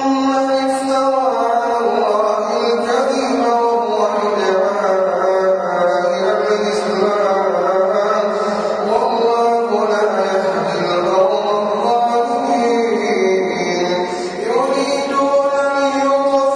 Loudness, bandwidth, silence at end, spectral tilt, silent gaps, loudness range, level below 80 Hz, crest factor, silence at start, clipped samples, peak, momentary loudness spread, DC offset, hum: -16 LUFS; 10.5 kHz; 0 s; -4.5 dB/octave; none; 1 LU; -60 dBFS; 12 dB; 0 s; under 0.1%; -4 dBFS; 3 LU; under 0.1%; none